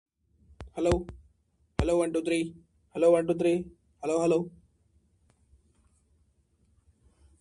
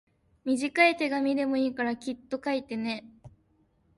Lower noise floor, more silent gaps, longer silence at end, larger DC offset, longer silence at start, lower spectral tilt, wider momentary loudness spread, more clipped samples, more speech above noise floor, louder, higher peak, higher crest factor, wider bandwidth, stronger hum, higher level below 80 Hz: about the same, -69 dBFS vs -68 dBFS; neither; first, 2.9 s vs 0.7 s; neither; first, 0.6 s vs 0.45 s; first, -6.5 dB/octave vs -4 dB/octave; first, 18 LU vs 13 LU; neither; about the same, 43 dB vs 40 dB; about the same, -28 LUFS vs -28 LUFS; about the same, -8 dBFS vs -8 dBFS; about the same, 24 dB vs 22 dB; about the same, 11.5 kHz vs 11.5 kHz; neither; first, -48 dBFS vs -68 dBFS